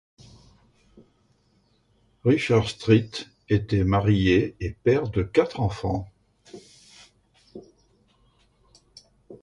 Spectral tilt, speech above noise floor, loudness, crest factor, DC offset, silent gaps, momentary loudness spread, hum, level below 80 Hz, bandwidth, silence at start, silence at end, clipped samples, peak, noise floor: -7 dB/octave; 43 dB; -23 LUFS; 20 dB; under 0.1%; none; 25 LU; none; -44 dBFS; 11 kHz; 2.25 s; 0.1 s; under 0.1%; -6 dBFS; -65 dBFS